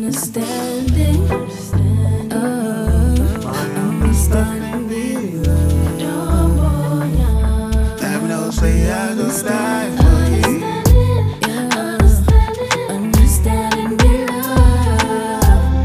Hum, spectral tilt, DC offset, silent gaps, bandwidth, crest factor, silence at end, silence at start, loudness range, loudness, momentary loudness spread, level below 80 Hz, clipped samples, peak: none; -6 dB/octave; under 0.1%; none; 15.5 kHz; 14 dB; 0 s; 0 s; 3 LU; -16 LUFS; 7 LU; -18 dBFS; under 0.1%; 0 dBFS